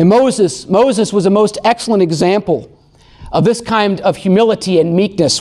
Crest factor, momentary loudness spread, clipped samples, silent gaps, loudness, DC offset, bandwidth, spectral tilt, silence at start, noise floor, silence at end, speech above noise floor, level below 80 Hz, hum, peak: 10 dB; 4 LU; under 0.1%; none; -13 LUFS; under 0.1%; 12 kHz; -5.5 dB/octave; 0 s; -44 dBFS; 0 s; 32 dB; -46 dBFS; none; -2 dBFS